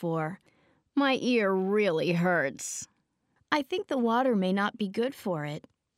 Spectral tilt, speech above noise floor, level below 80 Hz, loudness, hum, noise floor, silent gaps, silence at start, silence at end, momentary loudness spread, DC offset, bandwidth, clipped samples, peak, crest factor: -5 dB/octave; 46 dB; -76 dBFS; -28 LUFS; none; -73 dBFS; none; 0 s; 0.4 s; 11 LU; under 0.1%; 15.5 kHz; under 0.1%; -10 dBFS; 20 dB